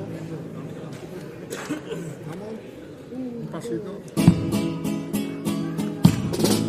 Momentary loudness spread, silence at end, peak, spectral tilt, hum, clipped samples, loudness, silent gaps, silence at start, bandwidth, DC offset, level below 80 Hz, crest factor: 17 LU; 0 s; 0 dBFS; -6 dB/octave; none; under 0.1%; -26 LUFS; none; 0 s; 15.5 kHz; under 0.1%; -50 dBFS; 24 dB